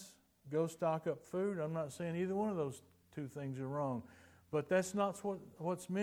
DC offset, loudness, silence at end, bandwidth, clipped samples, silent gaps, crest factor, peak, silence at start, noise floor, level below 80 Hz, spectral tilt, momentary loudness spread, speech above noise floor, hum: under 0.1%; -40 LUFS; 0 s; 18 kHz; under 0.1%; none; 18 dB; -22 dBFS; 0 s; -59 dBFS; -80 dBFS; -6.5 dB/octave; 11 LU; 20 dB; none